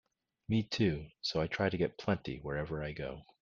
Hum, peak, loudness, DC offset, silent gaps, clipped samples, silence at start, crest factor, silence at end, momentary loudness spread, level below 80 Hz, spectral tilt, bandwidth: none; -16 dBFS; -36 LUFS; under 0.1%; none; under 0.1%; 0.5 s; 20 dB; 0.2 s; 8 LU; -56 dBFS; -6.5 dB/octave; 7.4 kHz